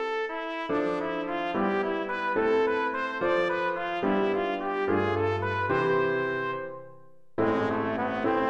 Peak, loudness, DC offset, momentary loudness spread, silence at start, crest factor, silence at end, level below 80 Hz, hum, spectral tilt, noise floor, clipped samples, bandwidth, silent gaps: -12 dBFS; -28 LUFS; under 0.1%; 6 LU; 0 s; 16 dB; 0 s; -60 dBFS; none; -7 dB/octave; -55 dBFS; under 0.1%; 8 kHz; none